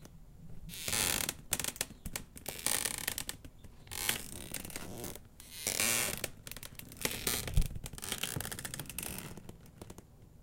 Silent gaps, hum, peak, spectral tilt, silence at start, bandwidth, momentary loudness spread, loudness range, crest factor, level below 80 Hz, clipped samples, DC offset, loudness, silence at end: none; none; -12 dBFS; -1.5 dB/octave; 0 s; 17 kHz; 21 LU; 3 LU; 26 dB; -46 dBFS; under 0.1%; under 0.1%; -36 LUFS; 0 s